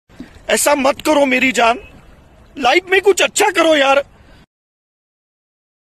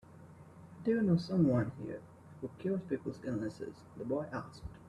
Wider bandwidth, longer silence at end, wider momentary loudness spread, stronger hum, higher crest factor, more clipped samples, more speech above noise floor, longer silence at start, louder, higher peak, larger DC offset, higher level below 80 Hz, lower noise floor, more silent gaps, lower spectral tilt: first, 13.5 kHz vs 10.5 kHz; first, 1.85 s vs 0 s; second, 7 LU vs 25 LU; neither; about the same, 16 dB vs 18 dB; neither; first, 31 dB vs 20 dB; about the same, 0.2 s vs 0.1 s; first, -13 LUFS vs -35 LUFS; first, 0 dBFS vs -18 dBFS; neither; first, -48 dBFS vs -62 dBFS; second, -44 dBFS vs -55 dBFS; neither; second, -1.5 dB/octave vs -8.5 dB/octave